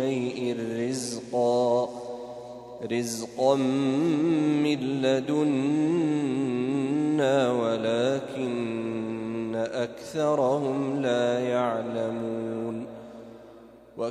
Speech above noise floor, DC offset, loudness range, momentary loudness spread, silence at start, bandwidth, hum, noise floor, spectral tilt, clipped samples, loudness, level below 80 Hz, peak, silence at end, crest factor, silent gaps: 24 dB; under 0.1%; 4 LU; 12 LU; 0 s; 13 kHz; none; -49 dBFS; -6 dB/octave; under 0.1%; -27 LUFS; -68 dBFS; -10 dBFS; 0 s; 18 dB; none